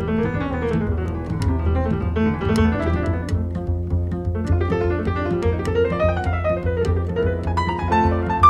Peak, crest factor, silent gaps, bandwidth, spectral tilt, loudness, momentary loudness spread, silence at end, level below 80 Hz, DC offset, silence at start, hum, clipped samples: -2 dBFS; 18 dB; none; 10.5 kHz; -8 dB/octave; -22 LUFS; 5 LU; 0 s; -30 dBFS; 0.2%; 0 s; none; under 0.1%